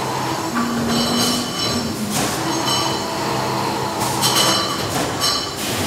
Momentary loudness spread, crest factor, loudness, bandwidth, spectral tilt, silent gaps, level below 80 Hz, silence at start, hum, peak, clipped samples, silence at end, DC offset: 6 LU; 18 dB; -19 LUFS; 16 kHz; -3 dB/octave; none; -48 dBFS; 0 s; none; -2 dBFS; under 0.1%; 0 s; under 0.1%